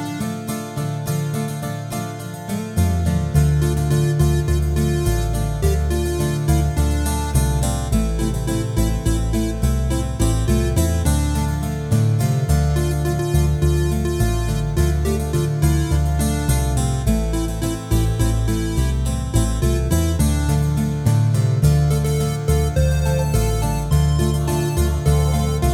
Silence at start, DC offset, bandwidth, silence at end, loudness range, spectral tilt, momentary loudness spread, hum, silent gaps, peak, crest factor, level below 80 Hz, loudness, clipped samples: 0 s; under 0.1%; 16.5 kHz; 0 s; 2 LU; -6 dB/octave; 5 LU; none; none; -2 dBFS; 16 dB; -22 dBFS; -20 LUFS; under 0.1%